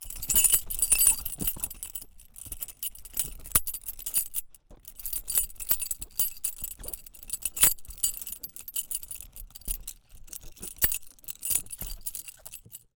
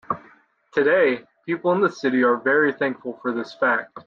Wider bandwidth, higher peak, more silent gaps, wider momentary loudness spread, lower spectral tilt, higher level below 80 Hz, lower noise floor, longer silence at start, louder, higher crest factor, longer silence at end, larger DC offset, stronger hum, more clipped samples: first, over 20 kHz vs 7.2 kHz; first, -4 dBFS vs -8 dBFS; neither; first, 20 LU vs 11 LU; second, 0 dB/octave vs -6.5 dB/octave; first, -46 dBFS vs -70 dBFS; second, -50 dBFS vs -54 dBFS; about the same, 0 s vs 0.1 s; second, -27 LUFS vs -22 LUFS; first, 26 dB vs 14 dB; first, 0.2 s vs 0.05 s; neither; neither; neither